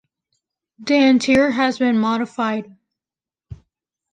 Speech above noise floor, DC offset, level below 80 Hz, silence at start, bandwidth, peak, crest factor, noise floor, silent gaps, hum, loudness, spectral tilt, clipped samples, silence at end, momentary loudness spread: over 73 dB; under 0.1%; -54 dBFS; 0.8 s; 9.6 kHz; -4 dBFS; 16 dB; under -90 dBFS; none; none; -17 LUFS; -5 dB/octave; under 0.1%; 0.6 s; 9 LU